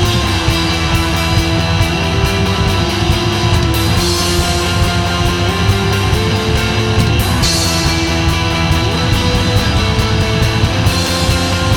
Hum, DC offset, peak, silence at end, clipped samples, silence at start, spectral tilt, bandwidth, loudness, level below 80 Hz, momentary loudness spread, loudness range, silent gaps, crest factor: none; under 0.1%; 0 dBFS; 0 s; under 0.1%; 0 s; -4.5 dB/octave; 19 kHz; -13 LUFS; -22 dBFS; 1 LU; 0 LU; none; 12 dB